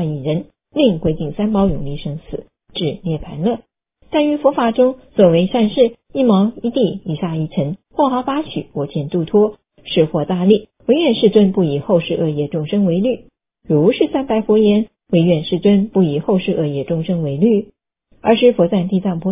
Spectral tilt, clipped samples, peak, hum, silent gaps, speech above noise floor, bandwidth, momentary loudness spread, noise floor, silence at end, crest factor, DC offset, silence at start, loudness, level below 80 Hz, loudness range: -11.5 dB/octave; under 0.1%; 0 dBFS; none; none; 40 dB; 3.8 kHz; 10 LU; -56 dBFS; 0 s; 16 dB; under 0.1%; 0 s; -16 LUFS; -44 dBFS; 4 LU